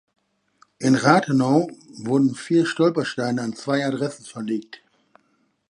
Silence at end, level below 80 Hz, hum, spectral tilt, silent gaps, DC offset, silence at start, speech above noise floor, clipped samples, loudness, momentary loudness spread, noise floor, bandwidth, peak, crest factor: 1.1 s; -70 dBFS; none; -6 dB/octave; none; under 0.1%; 0.8 s; 45 dB; under 0.1%; -21 LUFS; 12 LU; -66 dBFS; 11.5 kHz; 0 dBFS; 22 dB